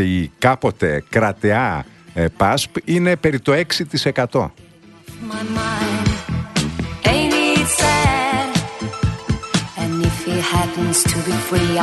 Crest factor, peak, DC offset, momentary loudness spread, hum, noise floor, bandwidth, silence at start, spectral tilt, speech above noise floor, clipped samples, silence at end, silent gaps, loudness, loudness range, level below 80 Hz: 18 dB; 0 dBFS; under 0.1%; 8 LU; none; -41 dBFS; 12.5 kHz; 0 s; -4.5 dB/octave; 23 dB; under 0.1%; 0 s; none; -18 LUFS; 3 LU; -34 dBFS